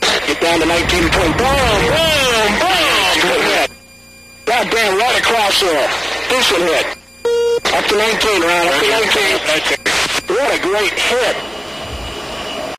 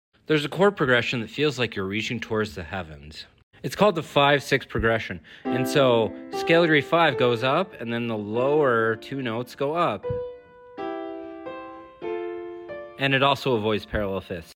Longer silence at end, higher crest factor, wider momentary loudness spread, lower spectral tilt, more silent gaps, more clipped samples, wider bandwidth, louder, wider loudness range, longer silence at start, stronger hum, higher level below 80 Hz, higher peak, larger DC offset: about the same, 0 s vs 0.05 s; about the same, 14 dB vs 18 dB; second, 11 LU vs 17 LU; second, -2.5 dB/octave vs -5.5 dB/octave; second, none vs 3.43-3.51 s; neither; about the same, 15.5 kHz vs 17 kHz; first, -14 LUFS vs -24 LUFS; second, 2 LU vs 8 LU; second, 0 s vs 0.3 s; neither; first, -34 dBFS vs -50 dBFS; first, -2 dBFS vs -8 dBFS; neither